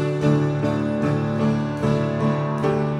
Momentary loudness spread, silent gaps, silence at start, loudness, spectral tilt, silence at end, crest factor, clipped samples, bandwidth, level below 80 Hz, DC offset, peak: 3 LU; none; 0 s; -22 LUFS; -8.5 dB/octave; 0 s; 14 dB; under 0.1%; 9.8 kHz; -48 dBFS; under 0.1%; -8 dBFS